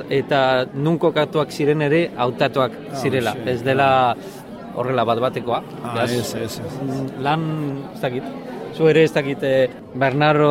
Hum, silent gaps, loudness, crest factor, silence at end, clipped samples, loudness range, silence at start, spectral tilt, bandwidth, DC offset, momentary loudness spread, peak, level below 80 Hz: none; none; -20 LUFS; 16 dB; 0 s; under 0.1%; 4 LU; 0 s; -6 dB/octave; 16 kHz; under 0.1%; 11 LU; -4 dBFS; -56 dBFS